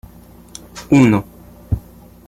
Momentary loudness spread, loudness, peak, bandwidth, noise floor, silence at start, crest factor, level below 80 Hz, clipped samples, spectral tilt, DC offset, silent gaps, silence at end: 25 LU; -16 LUFS; -2 dBFS; 13.5 kHz; -42 dBFS; 0.75 s; 16 dB; -38 dBFS; under 0.1%; -7 dB/octave; under 0.1%; none; 0.5 s